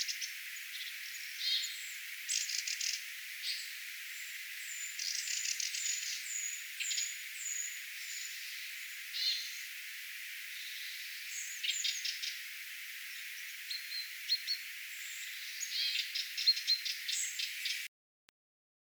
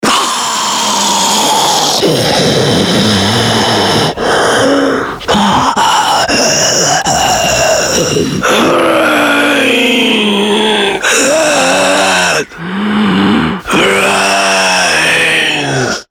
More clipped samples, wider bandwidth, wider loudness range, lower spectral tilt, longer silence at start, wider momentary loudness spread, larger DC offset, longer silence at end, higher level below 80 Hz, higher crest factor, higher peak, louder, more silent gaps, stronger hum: neither; about the same, over 20 kHz vs 19.5 kHz; first, 5 LU vs 1 LU; second, 11 dB/octave vs -2.5 dB/octave; about the same, 0 s vs 0 s; first, 9 LU vs 4 LU; neither; first, 1.05 s vs 0.1 s; second, under -90 dBFS vs -38 dBFS; first, 22 dB vs 10 dB; second, -18 dBFS vs 0 dBFS; second, -37 LUFS vs -9 LUFS; neither; neither